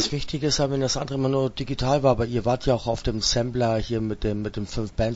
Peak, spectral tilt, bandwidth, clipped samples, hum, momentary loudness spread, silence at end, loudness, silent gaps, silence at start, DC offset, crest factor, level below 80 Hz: -6 dBFS; -5 dB/octave; 8 kHz; under 0.1%; none; 6 LU; 0 s; -24 LUFS; none; 0 s; under 0.1%; 18 dB; -38 dBFS